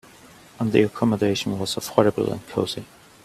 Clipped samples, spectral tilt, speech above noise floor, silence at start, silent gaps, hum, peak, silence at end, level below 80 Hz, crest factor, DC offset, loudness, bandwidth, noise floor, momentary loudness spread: under 0.1%; -5.5 dB/octave; 26 dB; 0.6 s; none; none; 0 dBFS; 0.4 s; -56 dBFS; 22 dB; under 0.1%; -23 LUFS; 15 kHz; -48 dBFS; 8 LU